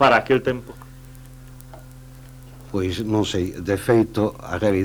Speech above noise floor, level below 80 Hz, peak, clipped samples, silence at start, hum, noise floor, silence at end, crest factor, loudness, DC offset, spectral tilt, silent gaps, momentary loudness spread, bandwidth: 21 dB; -46 dBFS; -4 dBFS; under 0.1%; 0 s; none; -41 dBFS; 0 s; 20 dB; -22 LUFS; under 0.1%; -6 dB/octave; none; 24 LU; over 20 kHz